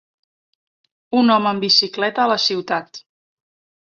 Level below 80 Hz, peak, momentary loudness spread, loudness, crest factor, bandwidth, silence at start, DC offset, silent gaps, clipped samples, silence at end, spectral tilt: -68 dBFS; -2 dBFS; 9 LU; -17 LUFS; 18 dB; 7.6 kHz; 1.1 s; under 0.1%; none; under 0.1%; 0.8 s; -3.5 dB/octave